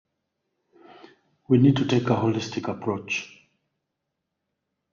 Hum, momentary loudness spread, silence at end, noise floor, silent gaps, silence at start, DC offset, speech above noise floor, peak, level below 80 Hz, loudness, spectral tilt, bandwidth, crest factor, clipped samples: none; 11 LU; 1.65 s; -82 dBFS; none; 1.5 s; under 0.1%; 59 dB; -6 dBFS; -62 dBFS; -23 LUFS; -6.5 dB/octave; 7.2 kHz; 20 dB; under 0.1%